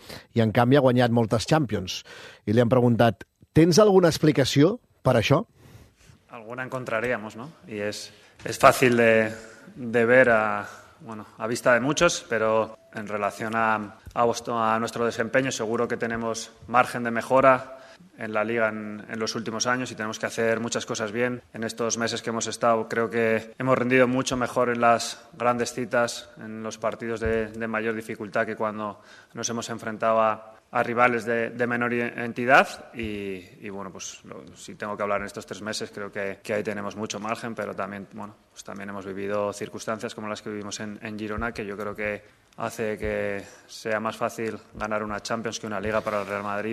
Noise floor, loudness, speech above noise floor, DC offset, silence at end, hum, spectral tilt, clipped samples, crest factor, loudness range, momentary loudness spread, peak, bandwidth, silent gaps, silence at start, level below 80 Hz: -55 dBFS; -25 LUFS; 30 dB; under 0.1%; 0 s; none; -5 dB/octave; under 0.1%; 24 dB; 10 LU; 17 LU; -2 dBFS; 14 kHz; none; 0.05 s; -56 dBFS